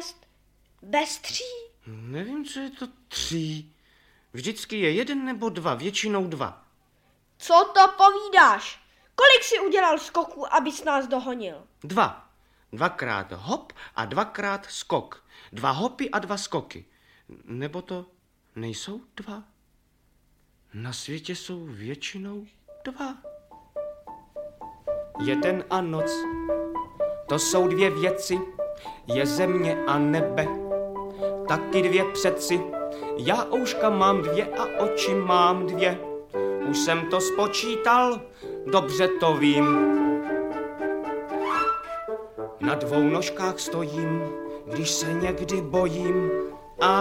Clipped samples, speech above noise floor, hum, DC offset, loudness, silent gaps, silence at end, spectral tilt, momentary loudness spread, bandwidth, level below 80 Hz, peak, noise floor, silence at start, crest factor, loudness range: under 0.1%; 40 dB; none; under 0.1%; -24 LUFS; none; 0 s; -4 dB/octave; 18 LU; 16.5 kHz; -56 dBFS; -4 dBFS; -65 dBFS; 0 s; 22 dB; 16 LU